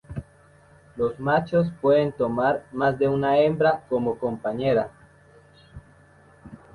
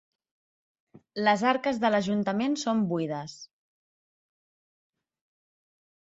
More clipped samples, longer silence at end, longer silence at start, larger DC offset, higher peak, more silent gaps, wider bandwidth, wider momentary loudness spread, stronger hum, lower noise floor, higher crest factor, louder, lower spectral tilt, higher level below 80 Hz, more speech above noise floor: neither; second, 0.2 s vs 2.6 s; second, 0.1 s vs 1.15 s; neither; about the same, -8 dBFS vs -8 dBFS; neither; first, 11 kHz vs 8 kHz; second, 8 LU vs 15 LU; neither; second, -54 dBFS vs under -90 dBFS; about the same, 18 dB vs 22 dB; first, -23 LUFS vs -27 LUFS; first, -8.5 dB/octave vs -5.5 dB/octave; first, -54 dBFS vs -72 dBFS; second, 32 dB vs over 63 dB